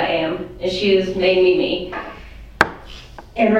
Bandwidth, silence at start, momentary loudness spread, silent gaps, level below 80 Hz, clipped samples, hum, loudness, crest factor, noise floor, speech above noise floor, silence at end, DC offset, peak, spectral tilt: 9.6 kHz; 0 s; 22 LU; none; -42 dBFS; under 0.1%; none; -18 LUFS; 18 dB; -38 dBFS; 20 dB; 0 s; under 0.1%; 0 dBFS; -5.5 dB/octave